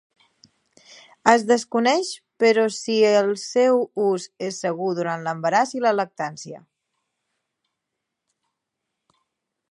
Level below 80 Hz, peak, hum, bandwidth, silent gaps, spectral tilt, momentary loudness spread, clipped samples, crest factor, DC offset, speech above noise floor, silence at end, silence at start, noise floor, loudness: -74 dBFS; 0 dBFS; none; 11.5 kHz; none; -4 dB/octave; 11 LU; under 0.1%; 22 dB; under 0.1%; 61 dB; 3.1 s; 1.25 s; -82 dBFS; -21 LUFS